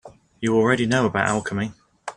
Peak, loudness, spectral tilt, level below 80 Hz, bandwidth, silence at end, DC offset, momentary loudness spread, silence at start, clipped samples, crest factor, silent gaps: -4 dBFS; -22 LUFS; -5.5 dB/octave; -54 dBFS; 11 kHz; 0.05 s; under 0.1%; 11 LU; 0.05 s; under 0.1%; 18 dB; none